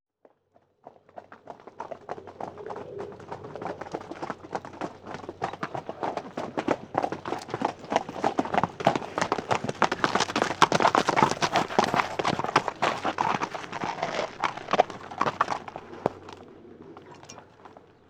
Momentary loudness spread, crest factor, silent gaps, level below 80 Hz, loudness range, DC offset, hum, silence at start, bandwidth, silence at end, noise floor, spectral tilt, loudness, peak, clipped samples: 22 LU; 26 dB; none; -64 dBFS; 14 LU; under 0.1%; none; 0.85 s; 17 kHz; 0.3 s; -66 dBFS; -4 dB/octave; -28 LUFS; -4 dBFS; under 0.1%